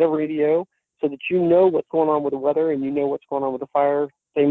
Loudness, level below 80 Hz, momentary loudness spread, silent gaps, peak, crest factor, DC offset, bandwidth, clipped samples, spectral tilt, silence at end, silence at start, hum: -21 LUFS; -64 dBFS; 9 LU; none; -6 dBFS; 14 dB; under 0.1%; 4.1 kHz; under 0.1%; -9.5 dB/octave; 0 s; 0 s; none